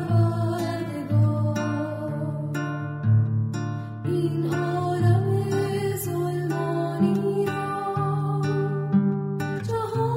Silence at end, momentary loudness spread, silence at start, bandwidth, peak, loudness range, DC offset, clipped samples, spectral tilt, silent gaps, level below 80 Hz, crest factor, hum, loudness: 0 s; 7 LU; 0 s; 16 kHz; -10 dBFS; 2 LU; under 0.1%; under 0.1%; -8 dB/octave; none; -60 dBFS; 14 dB; none; -25 LUFS